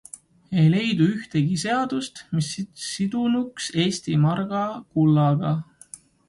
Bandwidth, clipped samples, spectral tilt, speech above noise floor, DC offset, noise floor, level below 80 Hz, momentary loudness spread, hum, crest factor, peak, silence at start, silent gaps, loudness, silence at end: 11.5 kHz; under 0.1%; -6 dB/octave; 25 dB; under 0.1%; -47 dBFS; -60 dBFS; 11 LU; none; 16 dB; -8 dBFS; 0.5 s; none; -23 LUFS; 0.65 s